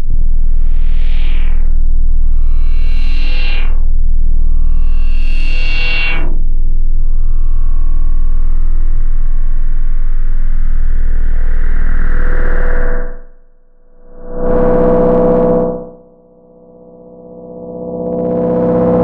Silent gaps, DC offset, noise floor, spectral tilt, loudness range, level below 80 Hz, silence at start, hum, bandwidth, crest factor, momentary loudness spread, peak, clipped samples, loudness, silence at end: none; under 0.1%; -43 dBFS; -8.5 dB/octave; 5 LU; -8 dBFS; 0 s; none; 4.6 kHz; 4 dB; 10 LU; -2 dBFS; under 0.1%; -17 LUFS; 0 s